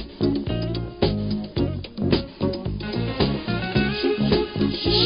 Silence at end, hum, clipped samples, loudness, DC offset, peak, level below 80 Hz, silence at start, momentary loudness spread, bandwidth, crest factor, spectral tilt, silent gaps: 0 s; none; under 0.1%; -24 LUFS; under 0.1%; -6 dBFS; -36 dBFS; 0 s; 6 LU; 5.4 kHz; 18 dB; -10.5 dB/octave; none